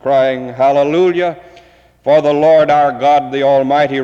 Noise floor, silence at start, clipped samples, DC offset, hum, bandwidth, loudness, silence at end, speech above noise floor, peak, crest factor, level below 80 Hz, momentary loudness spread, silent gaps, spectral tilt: -44 dBFS; 0.05 s; under 0.1%; under 0.1%; none; 7.8 kHz; -12 LUFS; 0 s; 33 dB; -2 dBFS; 10 dB; -54 dBFS; 7 LU; none; -6.5 dB/octave